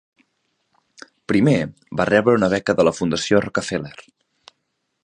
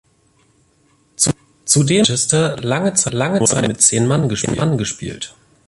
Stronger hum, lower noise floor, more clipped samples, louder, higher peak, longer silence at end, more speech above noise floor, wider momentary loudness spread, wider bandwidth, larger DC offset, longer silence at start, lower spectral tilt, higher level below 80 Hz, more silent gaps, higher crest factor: neither; first, -74 dBFS vs -57 dBFS; neither; second, -19 LUFS vs -16 LUFS; about the same, -2 dBFS vs 0 dBFS; first, 1 s vs 0.4 s; first, 55 dB vs 41 dB; about the same, 11 LU vs 13 LU; second, 10.5 kHz vs 12 kHz; neither; about the same, 1.3 s vs 1.2 s; first, -5.5 dB/octave vs -4 dB/octave; second, -52 dBFS vs -46 dBFS; neither; about the same, 20 dB vs 18 dB